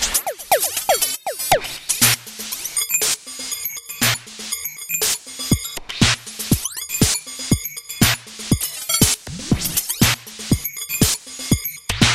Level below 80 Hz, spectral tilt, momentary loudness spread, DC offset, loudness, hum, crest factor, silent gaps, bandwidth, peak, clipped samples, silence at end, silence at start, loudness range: -36 dBFS; -2.5 dB/octave; 9 LU; under 0.1%; -19 LUFS; none; 20 dB; none; 16 kHz; 0 dBFS; under 0.1%; 0 s; 0 s; 2 LU